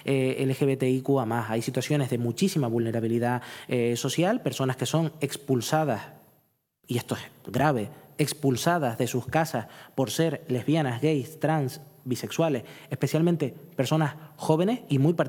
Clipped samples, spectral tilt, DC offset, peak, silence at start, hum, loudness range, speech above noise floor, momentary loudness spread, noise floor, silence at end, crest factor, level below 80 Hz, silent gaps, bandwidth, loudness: under 0.1%; -6 dB/octave; under 0.1%; -6 dBFS; 0.05 s; none; 2 LU; 43 dB; 8 LU; -69 dBFS; 0 s; 20 dB; -70 dBFS; none; 19 kHz; -27 LUFS